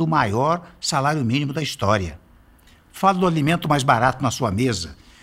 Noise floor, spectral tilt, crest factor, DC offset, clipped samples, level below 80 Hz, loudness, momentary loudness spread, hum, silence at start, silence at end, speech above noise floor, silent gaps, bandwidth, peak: -52 dBFS; -5 dB/octave; 18 dB; under 0.1%; under 0.1%; -48 dBFS; -21 LUFS; 6 LU; none; 0 s; 0.3 s; 31 dB; none; 16 kHz; -4 dBFS